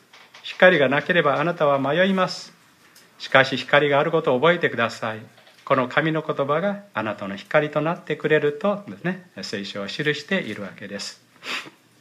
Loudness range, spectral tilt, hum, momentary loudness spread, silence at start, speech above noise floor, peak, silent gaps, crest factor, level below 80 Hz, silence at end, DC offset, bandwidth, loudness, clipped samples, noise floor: 5 LU; -5.5 dB/octave; none; 15 LU; 0.35 s; 31 dB; 0 dBFS; none; 22 dB; -72 dBFS; 0.3 s; under 0.1%; 13.5 kHz; -21 LUFS; under 0.1%; -53 dBFS